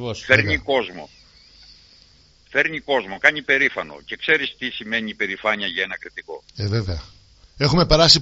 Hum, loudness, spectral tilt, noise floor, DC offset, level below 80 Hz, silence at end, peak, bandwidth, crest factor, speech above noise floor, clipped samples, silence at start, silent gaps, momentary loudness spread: none; -20 LUFS; -2 dB/octave; -53 dBFS; under 0.1%; -40 dBFS; 0 s; 0 dBFS; 8 kHz; 22 dB; 32 dB; under 0.1%; 0 s; none; 16 LU